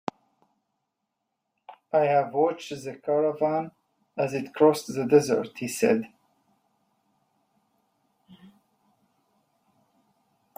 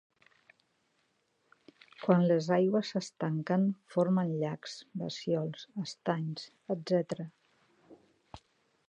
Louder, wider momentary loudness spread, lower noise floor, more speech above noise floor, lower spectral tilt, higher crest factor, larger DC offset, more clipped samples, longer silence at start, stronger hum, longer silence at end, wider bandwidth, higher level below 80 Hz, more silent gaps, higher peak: first, -25 LUFS vs -32 LUFS; about the same, 14 LU vs 13 LU; first, -81 dBFS vs -75 dBFS; first, 57 dB vs 44 dB; second, -5.5 dB/octave vs -7 dB/octave; about the same, 22 dB vs 22 dB; neither; neither; second, 1.7 s vs 2 s; neither; first, 4.5 s vs 0.5 s; first, 16 kHz vs 9 kHz; about the same, -74 dBFS vs -74 dBFS; neither; first, -6 dBFS vs -12 dBFS